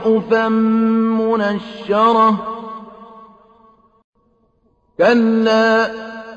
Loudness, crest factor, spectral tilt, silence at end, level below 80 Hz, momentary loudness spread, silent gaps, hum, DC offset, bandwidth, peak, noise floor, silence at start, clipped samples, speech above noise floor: -15 LUFS; 14 dB; -6.5 dB/octave; 0 s; -56 dBFS; 17 LU; 4.04-4.13 s; none; under 0.1%; 7.2 kHz; -2 dBFS; -60 dBFS; 0 s; under 0.1%; 45 dB